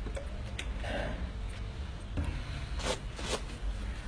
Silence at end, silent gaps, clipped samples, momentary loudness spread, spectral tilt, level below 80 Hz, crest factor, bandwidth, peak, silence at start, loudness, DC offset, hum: 0 s; none; under 0.1%; 5 LU; -4.5 dB/octave; -38 dBFS; 18 dB; 10.5 kHz; -18 dBFS; 0 s; -38 LUFS; under 0.1%; none